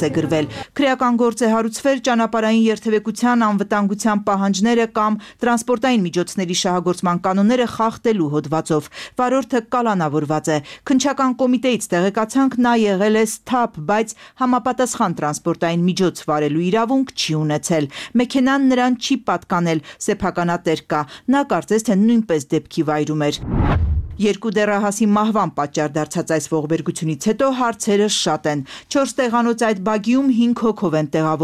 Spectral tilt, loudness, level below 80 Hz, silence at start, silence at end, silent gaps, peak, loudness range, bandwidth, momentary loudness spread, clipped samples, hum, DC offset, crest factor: -5 dB/octave; -18 LUFS; -38 dBFS; 0 s; 0 s; none; -6 dBFS; 2 LU; 14.5 kHz; 5 LU; under 0.1%; none; under 0.1%; 12 dB